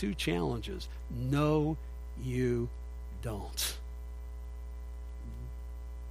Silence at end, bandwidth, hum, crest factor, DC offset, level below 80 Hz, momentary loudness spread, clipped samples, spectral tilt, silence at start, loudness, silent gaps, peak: 0 s; 15.5 kHz; 60 Hz at -40 dBFS; 18 dB; under 0.1%; -42 dBFS; 15 LU; under 0.1%; -5.5 dB/octave; 0 s; -36 LUFS; none; -16 dBFS